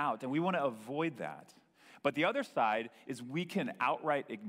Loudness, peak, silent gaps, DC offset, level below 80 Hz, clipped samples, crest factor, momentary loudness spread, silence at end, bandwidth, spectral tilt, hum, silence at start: -35 LUFS; -16 dBFS; none; under 0.1%; -84 dBFS; under 0.1%; 20 dB; 12 LU; 0 s; 16 kHz; -6 dB/octave; none; 0 s